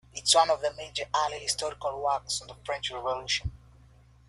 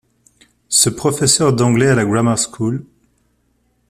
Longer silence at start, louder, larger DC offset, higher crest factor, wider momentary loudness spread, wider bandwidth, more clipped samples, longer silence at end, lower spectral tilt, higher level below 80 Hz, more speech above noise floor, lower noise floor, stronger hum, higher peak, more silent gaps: second, 0.15 s vs 0.7 s; second, -28 LUFS vs -14 LUFS; neither; about the same, 22 dB vs 18 dB; first, 11 LU vs 8 LU; second, 12.5 kHz vs 15 kHz; neither; second, 0.7 s vs 1.1 s; second, -1 dB/octave vs -4 dB/octave; about the same, -52 dBFS vs -48 dBFS; second, 27 dB vs 47 dB; second, -57 dBFS vs -62 dBFS; neither; second, -8 dBFS vs 0 dBFS; neither